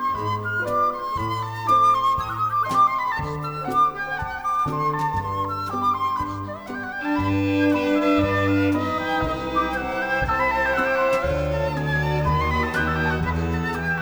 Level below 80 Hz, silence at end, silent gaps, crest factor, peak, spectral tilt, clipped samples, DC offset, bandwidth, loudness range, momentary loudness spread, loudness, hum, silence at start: -38 dBFS; 0 s; none; 14 dB; -8 dBFS; -6.5 dB/octave; under 0.1%; under 0.1%; over 20 kHz; 3 LU; 7 LU; -22 LUFS; none; 0 s